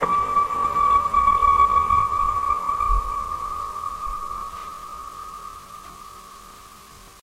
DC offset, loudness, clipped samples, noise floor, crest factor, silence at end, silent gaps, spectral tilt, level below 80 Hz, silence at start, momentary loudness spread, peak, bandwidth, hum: under 0.1%; -21 LUFS; under 0.1%; -45 dBFS; 16 dB; 0.1 s; none; -4.5 dB/octave; -36 dBFS; 0 s; 23 LU; -6 dBFS; 16 kHz; none